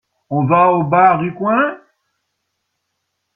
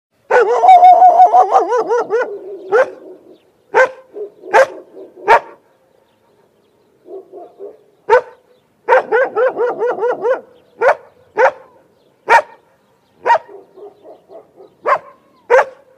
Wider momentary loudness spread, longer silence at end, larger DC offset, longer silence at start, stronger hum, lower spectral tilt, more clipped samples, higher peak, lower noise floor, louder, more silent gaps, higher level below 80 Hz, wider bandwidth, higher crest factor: second, 8 LU vs 21 LU; first, 1.6 s vs 0.25 s; neither; about the same, 0.3 s vs 0.3 s; neither; first, -10.5 dB/octave vs -3 dB/octave; second, under 0.1% vs 0.2%; about the same, 0 dBFS vs 0 dBFS; first, -73 dBFS vs -55 dBFS; about the same, -14 LUFS vs -13 LUFS; neither; about the same, -58 dBFS vs -60 dBFS; second, 3.9 kHz vs 10.5 kHz; about the same, 16 dB vs 14 dB